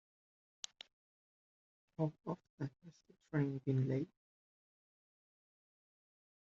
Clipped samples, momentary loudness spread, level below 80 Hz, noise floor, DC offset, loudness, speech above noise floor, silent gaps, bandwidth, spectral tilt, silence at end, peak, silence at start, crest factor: under 0.1%; 16 LU; -80 dBFS; under -90 dBFS; under 0.1%; -42 LUFS; over 50 dB; 2.50-2.58 s; 7.4 kHz; -7.5 dB/octave; 2.5 s; -24 dBFS; 2 s; 22 dB